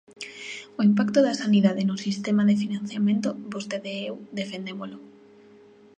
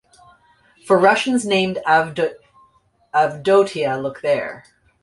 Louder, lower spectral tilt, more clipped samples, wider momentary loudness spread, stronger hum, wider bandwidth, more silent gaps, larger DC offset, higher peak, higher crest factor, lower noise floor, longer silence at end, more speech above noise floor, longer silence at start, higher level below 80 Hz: second, -25 LUFS vs -18 LUFS; first, -6 dB/octave vs -4.5 dB/octave; neither; first, 16 LU vs 8 LU; neither; second, 9 kHz vs 11.5 kHz; neither; neither; second, -8 dBFS vs -2 dBFS; about the same, 18 dB vs 18 dB; second, -52 dBFS vs -58 dBFS; first, 0.9 s vs 0.45 s; second, 28 dB vs 41 dB; second, 0.2 s vs 0.85 s; second, -72 dBFS vs -60 dBFS